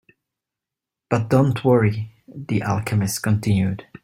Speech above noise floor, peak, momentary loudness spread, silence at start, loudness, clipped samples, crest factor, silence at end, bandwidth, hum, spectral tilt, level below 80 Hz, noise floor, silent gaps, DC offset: 67 dB; -2 dBFS; 9 LU; 1.1 s; -21 LUFS; under 0.1%; 18 dB; 0.2 s; 16 kHz; none; -6.5 dB/octave; -52 dBFS; -87 dBFS; none; under 0.1%